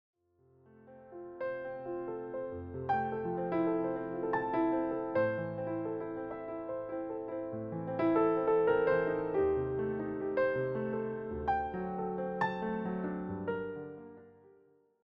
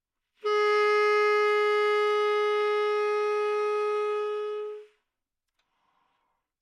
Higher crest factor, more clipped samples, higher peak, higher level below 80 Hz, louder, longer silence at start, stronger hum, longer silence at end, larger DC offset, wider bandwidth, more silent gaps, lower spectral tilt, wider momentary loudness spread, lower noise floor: about the same, 16 dB vs 12 dB; neither; second, -18 dBFS vs -14 dBFS; first, -60 dBFS vs under -90 dBFS; second, -34 LUFS vs -25 LUFS; first, 0.85 s vs 0.45 s; neither; second, 0.75 s vs 1.8 s; neither; second, 5.8 kHz vs 10 kHz; neither; first, -6.5 dB/octave vs -0.5 dB/octave; about the same, 12 LU vs 11 LU; second, -67 dBFS vs -85 dBFS